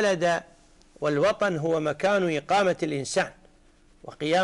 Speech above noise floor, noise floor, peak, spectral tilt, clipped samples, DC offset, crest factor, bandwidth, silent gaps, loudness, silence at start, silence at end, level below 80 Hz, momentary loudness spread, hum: 33 dB; -57 dBFS; -14 dBFS; -4.5 dB/octave; under 0.1%; under 0.1%; 12 dB; 11.5 kHz; none; -25 LUFS; 0 s; 0 s; -58 dBFS; 8 LU; none